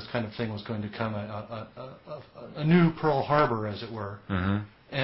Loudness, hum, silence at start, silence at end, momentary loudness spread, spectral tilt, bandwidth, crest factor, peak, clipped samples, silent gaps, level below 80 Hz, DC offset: -28 LUFS; none; 0 s; 0 s; 20 LU; -11 dB/octave; 5.8 kHz; 20 dB; -8 dBFS; under 0.1%; none; -52 dBFS; under 0.1%